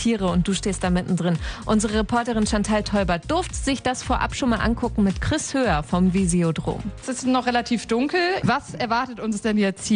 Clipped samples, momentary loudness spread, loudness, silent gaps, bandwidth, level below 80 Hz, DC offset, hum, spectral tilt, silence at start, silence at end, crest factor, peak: under 0.1%; 4 LU; -23 LUFS; none; 10 kHz; -36 dBFS; under 0.1%; none; -5 dB/octave; 0 s; 0 s; 14 dB; -8 dBFS